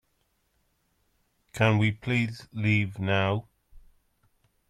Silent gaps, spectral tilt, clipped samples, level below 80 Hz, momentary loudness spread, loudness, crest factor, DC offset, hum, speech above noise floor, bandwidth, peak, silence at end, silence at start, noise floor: none; -7 dB/octave; under 0.1%; -58 dBFS; 9 LU; -27 LUFS; 22 dB; under 0.1%; none; 47 dB; 10 kHz; -8 dBFS; 0.9 s; 1.55 s; -73 dBFS